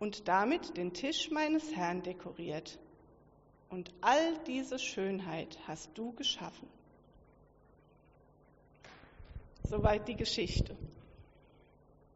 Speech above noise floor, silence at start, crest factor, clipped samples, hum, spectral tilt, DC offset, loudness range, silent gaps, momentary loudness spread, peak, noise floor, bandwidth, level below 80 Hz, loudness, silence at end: 29 dB; 0 s; 22 dB; under 0.1%; none; -3.5 dB/octave; under 0.1%; 8 LU; none; 23 LU; -16 dBFS; -64 dBFS; 8 kHz; -50 dBFS; -35 LUFS; 0.9 s